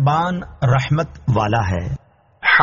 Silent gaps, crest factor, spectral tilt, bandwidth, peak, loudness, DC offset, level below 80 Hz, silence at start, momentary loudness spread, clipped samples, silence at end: none; 16 dB; -4.5 dB/octave; 7.2 kHz; -2 dBFS; -19 LUFS; under 0.1%; -38 dBFS; 0 s; 8 LU; under 0.1%; 0 s